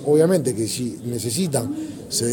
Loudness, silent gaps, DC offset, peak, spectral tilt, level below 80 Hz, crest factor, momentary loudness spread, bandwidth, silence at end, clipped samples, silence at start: -22 LUFS; none; under 0.1%; -4 dBFS; -5 dB/octave; -56 dBFS; 18 dB; 10 LU; 17.5 kHz; 0 s; under 0.1%; 0 s